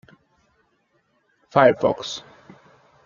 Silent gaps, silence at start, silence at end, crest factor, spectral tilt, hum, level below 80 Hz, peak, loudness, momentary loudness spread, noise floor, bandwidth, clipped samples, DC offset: none; 1.55 s; 0.85 s; 22 dB; -5 dB/octave; none; -64 dBFS; -2 dBFS; -20 LUFS; 16 LU; -67 dBFS; 7.4 kHz; under 0.1%; under 0.1%